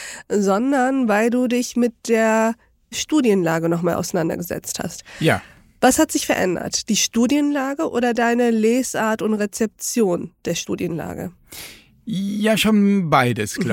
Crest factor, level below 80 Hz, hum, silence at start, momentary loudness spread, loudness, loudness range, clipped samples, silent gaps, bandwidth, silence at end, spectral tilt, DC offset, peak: 18 dB; -52 dBFS; none; 0 s; 11 LU; -19 LUFS; 3 LU; under 0.1%; none; 17 kHz; 0 s; -4.5 dB/octave; under 0.1%; -2 dBFS